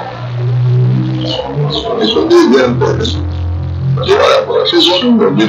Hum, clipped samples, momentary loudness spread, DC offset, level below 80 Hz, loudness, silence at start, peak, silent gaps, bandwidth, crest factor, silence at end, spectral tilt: none; 0.3%; 10 LU; under 0.1%; -32 dBFS; -11 LUFS; 0 s; 0 dBFS; none; 8.4 kHz; 10 dB; 0 s; -6.5 dB/octave